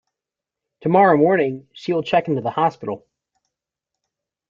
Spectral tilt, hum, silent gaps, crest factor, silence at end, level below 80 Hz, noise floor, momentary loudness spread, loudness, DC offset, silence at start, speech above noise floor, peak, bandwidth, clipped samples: -8 dB/octave; none; none; 20 dB; 1.55 s; -64 dBFS; -87 dBFS; 16 LU; -18 LUFS; under 0.1%; 0.85 s; 69 dB; -2 dBFS; 7.4 kHz; under 0.1%